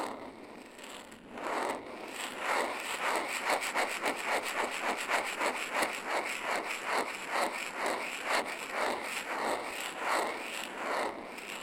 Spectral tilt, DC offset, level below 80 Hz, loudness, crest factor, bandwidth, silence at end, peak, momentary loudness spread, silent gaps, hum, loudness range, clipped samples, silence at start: -1 dB/octave; under 0.1%; -72 dBFS; -34 LUFS; 20 dB; 17 kHz; 0 s; -16 dBFS; 10 LU; none; none; 3 LU; under 0.1%; 0 s